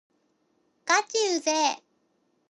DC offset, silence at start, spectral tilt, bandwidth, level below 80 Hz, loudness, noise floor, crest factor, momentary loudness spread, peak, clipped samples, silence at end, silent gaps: under 0.1%; 0.85 s; 1 dB/octave; 11.5 kHz; -88 dBFS; -25 LUFS; -71 dBFS; 22 dB; 13 LU; -8 dBFS; under 0.1%; 0.75 s; none